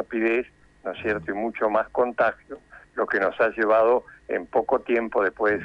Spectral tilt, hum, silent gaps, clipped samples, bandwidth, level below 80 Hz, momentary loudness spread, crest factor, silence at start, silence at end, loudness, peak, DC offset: -7 dB/octave; none; none; under 0.1%; 7.2 kHz; -58 dBFS; 16 LU; 16 dB; 0 s; 0 s; -24 LUFS; -8 dBFS; under 0.1%